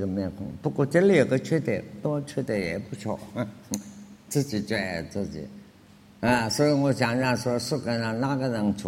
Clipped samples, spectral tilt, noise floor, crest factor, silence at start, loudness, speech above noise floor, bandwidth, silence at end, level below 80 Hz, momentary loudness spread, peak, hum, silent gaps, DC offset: under 0.1%; -5.5 dB/octave; -53 dBFS; 20 dB; 0 s; -26 LUFS; 27 dB; 16.5 kHz; 0 s; -56 dBFS; 12 LU; -6 dBFS; none; none; under 0.1%